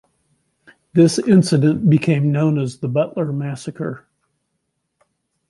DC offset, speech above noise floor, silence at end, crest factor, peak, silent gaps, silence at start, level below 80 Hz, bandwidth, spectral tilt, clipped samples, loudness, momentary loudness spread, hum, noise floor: under 0.1%; 57 dB; 1.5 s; 16 dB; -2 dBFS; none; 0.95 s; -58 dBFS; 11.5 kHz; -7 dB/octave; under 0.1%; -17 LUFS; 13 LU; none; -73 dBFS